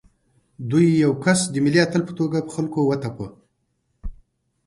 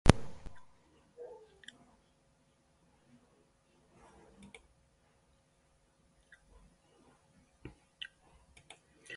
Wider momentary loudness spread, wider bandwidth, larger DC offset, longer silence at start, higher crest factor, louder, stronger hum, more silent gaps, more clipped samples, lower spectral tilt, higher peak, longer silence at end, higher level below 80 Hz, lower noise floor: first, 22 LU vs 16 LU; about the same, 11.5 kHz vs 11.5 kHz; neither; first, 0.6 s vs 0.05 s; second, 18 dB vs 38 dB; first, -20 LUFS vs -41 LUFS; neither; neither; neither; about the same, -5.5 dB/octave vs -5.5 dB/octave; about the same, -4 dBFS vs -2 dBFS; first, 0.55 s vs 0 s; about the same, -46 dBFS vs -48 dBFS; about the same, -71 dBFS vs -71 dBFS